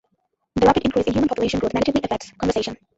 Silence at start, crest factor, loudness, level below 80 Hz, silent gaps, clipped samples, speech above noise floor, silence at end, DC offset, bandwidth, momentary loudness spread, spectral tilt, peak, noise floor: 0.55 s; 18 dB; -21 LUFS; -42 dBFS; none; under 0.1%; 51 dB; 0.2 s; under 0.1%; 8 kHz; 8 LU; -6 dB/octave; -2 dBFS; -71 dBFS